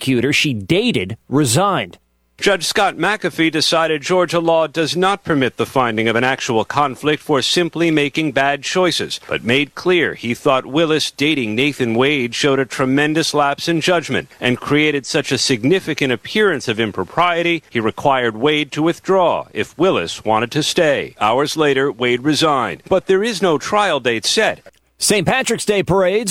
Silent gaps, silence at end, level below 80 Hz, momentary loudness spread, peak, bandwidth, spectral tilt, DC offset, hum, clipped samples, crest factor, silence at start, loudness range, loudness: none; 0 s; -52 dBFS; 4 LU; -2 dBFS; 16.5 kHz; -4 dB/octave; under 0.1%; none; under 0.1%; 16 dB; 0 s; 1 LU; -16 LUFS